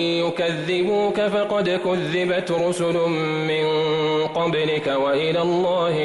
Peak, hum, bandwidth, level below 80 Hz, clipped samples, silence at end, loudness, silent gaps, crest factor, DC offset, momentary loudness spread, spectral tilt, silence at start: -12 dBFS; none; 12 kHz; -60 dBFS; under 0.1%; 0 s; -21 LUFS; none; 10 dB; under 0.1%; 2 LU; -5.5 dB/octave; 0 s